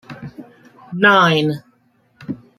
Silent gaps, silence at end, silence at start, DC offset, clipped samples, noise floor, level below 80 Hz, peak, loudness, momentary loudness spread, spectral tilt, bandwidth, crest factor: none; 0.2 s; 0.1 s; under 0.1%; under 0.1%; -59 dBFS; -62 dBFS; -2 dBFS; -14 LUFS; 24 LU; -5.5 dB/octave; 14 kHz; 18 dB